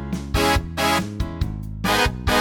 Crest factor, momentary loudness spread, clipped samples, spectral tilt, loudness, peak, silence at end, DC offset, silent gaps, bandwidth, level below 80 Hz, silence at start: 16 dB; 9 LU; under 0.1%; -4 dB/octave; -22 LUFS; -4 dBFS; 0 s; under 0.1%; none; 19.5 kHz; -30 dBFS; 0 s